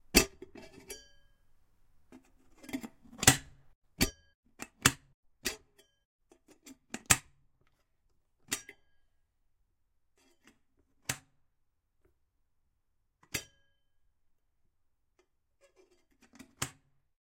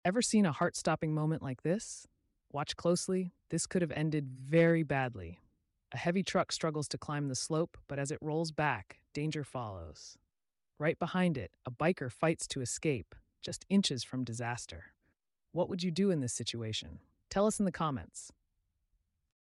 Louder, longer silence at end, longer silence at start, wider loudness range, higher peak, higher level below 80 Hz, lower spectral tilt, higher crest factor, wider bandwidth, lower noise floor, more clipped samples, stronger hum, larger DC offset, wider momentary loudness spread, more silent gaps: about the same, -32 LUFS vs -34 LUFS; second, 0.65 s vs 1.2 s; about the same, 0.15 s vs 0.05 s; first, 17 LU vs 4 LU; first, -4 dBFS vs -18 dBFS; first, -54 dBFS vs -64 dBFS; second, -2 dB/octave vs -5 dB/octave; first, 34 dB vs 16 dB; first, 16.5 kHz vs 12 kHz; second, -77 dBFS vs -88 dBFS; neither; neither; neither; first, 24 LU vs 14 LU; first, 3.75-3.82 s, 4.35-4.43 s, 5.14-5.23 s, 6.05-6.19 s vs none